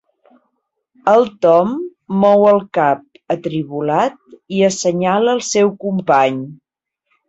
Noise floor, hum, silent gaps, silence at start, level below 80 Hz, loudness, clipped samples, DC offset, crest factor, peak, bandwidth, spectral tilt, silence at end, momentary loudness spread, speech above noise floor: -70 dBFS; none; none; 1.05 s; -62 dBFS; -15 LUFS; under 0.1%; under 0.1%; 16 dB; 0 dBFS; 8.2 kHz; -5 dB/octave; 0.75 s; 10 LU; 56 dB